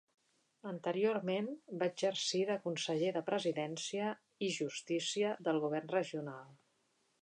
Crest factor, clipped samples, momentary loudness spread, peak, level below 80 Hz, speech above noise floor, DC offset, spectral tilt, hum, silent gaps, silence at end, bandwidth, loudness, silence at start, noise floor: 16 dB; under 0.1%; 8 LU; -22 dBFS; -90 dBFS; 41 dB; under 0.1%; -4 dB/octave; none; none; 0.7 s; 10.5 kHz; -37 LUFS; 0.65 s; -78 dBFS